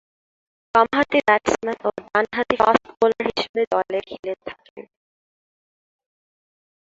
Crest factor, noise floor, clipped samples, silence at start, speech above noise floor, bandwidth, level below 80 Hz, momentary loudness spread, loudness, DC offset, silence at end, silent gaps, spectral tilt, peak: 22 dB; under -90 dBFS; under 0.1%; 0.75 s; over 69 dB; 7.8 kHz; -58 dBFS; 13 LU; -21 LUFS; under 0.1%; 2.05 s; 3.49-3.54 s, 3.67-3.71 s, 4.19-4.23 s, 4.70-4.76 s; -4 dB/octave; -2 dBFS